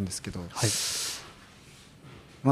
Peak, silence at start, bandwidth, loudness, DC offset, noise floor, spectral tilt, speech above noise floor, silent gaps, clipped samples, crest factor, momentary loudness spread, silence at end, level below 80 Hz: -12 dBFS; 0 s; 15.5 kHz; -30 LUFS; under 0.1%; -52 dBFS; -3.5 dB/octave; 21 dB; none; under 0.1%; 20 dB; 24 LU; 0 s; -58 dBFS